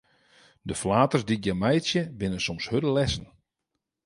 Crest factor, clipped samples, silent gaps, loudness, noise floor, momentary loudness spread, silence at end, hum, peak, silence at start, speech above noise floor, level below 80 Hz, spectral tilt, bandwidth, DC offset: 20 dB; under 0.1%; none; -26 LUFS; -83 dBFS; 9 LU; 0.8 s; none; -6 dBFS; 0.65 s; 57 dB; -48 dBFS; -5.5 dB/octave; 11.5 kHz; under 0.1%